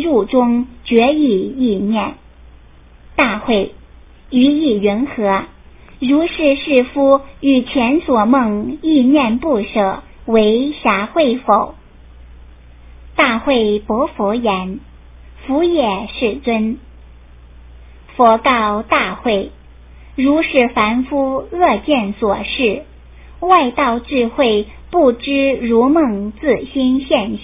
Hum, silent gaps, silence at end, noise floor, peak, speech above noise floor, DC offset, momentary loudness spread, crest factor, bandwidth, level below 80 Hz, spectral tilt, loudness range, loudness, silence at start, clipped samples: none; none; 0 s; -42 dBFS; 0 dBFS; 28 dB; under 0.1%; 7 LU; 16 dB; 3.9 kHz; -40 dBFS; -9.5 dB/octave; 4 LU; -15 LUFS; 0 s; under 0.1%